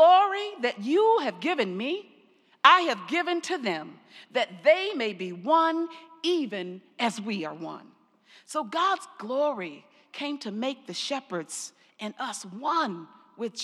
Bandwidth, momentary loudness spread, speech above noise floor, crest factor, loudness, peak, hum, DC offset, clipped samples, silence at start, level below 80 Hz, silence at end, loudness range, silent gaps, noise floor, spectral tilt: 13 kHz; 15 LU; 34 dB; 24 dB; -27 LUFS; -4 dBFS; none; under 0.1%; under 0.1%; 0 s; under -90 dBFS; 0 s; 8 LU; none; -61 dBFS; -3.5 dB/octave